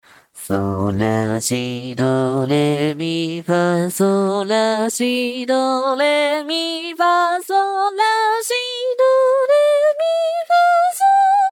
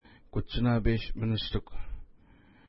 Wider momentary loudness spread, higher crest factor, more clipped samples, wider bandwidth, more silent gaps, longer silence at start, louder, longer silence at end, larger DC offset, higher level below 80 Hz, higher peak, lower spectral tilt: second, 7 LU vs 19 LU; about the same, 12 dB vs 16 dB; neither; first, 18 kHz vs 5.8 kHz; neither; about the same, 0.35 s vs 0.35 s; first, -17 LUFS vs -31 LUFS; second, 0 s vs 0.65 s; neither; second, -62 dBFS vs -38 dBFS; first, -6 dBFS vs -14 dBFS; second, -4.5 dB/octave vs -10.5 dB/octave